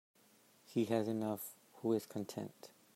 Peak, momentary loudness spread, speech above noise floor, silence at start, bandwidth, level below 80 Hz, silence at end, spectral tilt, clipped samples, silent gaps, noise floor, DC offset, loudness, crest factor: -20 dBFS; 13 LU; 30 dB; 0.7 s; 16 kHz; -86 dBFS; 0.25 s; -6 dB/octave; under 0.1%; none; -69 dBFS; under 0.1%; -40 LUFS; 20 dB